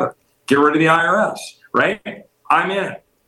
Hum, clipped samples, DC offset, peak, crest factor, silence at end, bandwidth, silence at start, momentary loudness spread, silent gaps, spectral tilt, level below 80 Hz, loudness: none; under 0.1%; under 0.1%; -2 dBFS; 16 dB; 0.3 s; 12.5 kHz; 0 s; 16 LU; none; -5 dB/octave; -64 dBFS; -17 LUFS